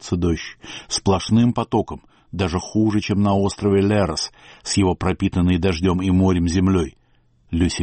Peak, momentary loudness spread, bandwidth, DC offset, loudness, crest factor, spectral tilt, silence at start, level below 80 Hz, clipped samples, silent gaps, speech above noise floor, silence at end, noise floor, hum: -6 dBFS; 11 LU; 8.8 kHz; under 0.1%; -20 LUFS; 12 dB; -6 dB/octave; 0.05 s; -38 dBFS; under 0.1%; none; 39 dB; 0 s; -58 dBFS; none